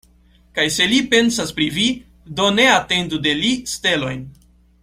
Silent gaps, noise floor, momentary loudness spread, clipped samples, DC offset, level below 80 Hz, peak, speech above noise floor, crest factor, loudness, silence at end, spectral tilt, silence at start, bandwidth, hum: none; -52 dBFS; 13 LU; under 0.1%; under 0.1%; -48 dBFS; 0 dBFS; 35 dB; 18 dB; -17 LUFS; 0.5 s; -3 dB/octave; 0.55 s; 16 kHz; none